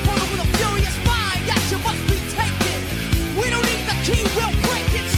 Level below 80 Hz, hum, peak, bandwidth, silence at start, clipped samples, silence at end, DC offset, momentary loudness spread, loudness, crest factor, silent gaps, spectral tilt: -28 dBFS; none; -4 dBFS; 19 kHz; 0 s; under 0.1%; 0 s; under 0.1%; 3 LU; -20 LUFS; 16 dB; none; -4 dB/octave